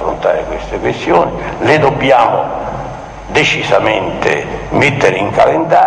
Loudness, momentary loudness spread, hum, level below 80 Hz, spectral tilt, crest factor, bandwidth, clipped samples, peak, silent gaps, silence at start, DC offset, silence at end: -12 LUFS; 10 LU; none; -34 dBFS; -5 dB/octave; 12 dB; 10 kHz; under 0.1%; 0 dBFS; none; 0 s; under 0.1%; 0 s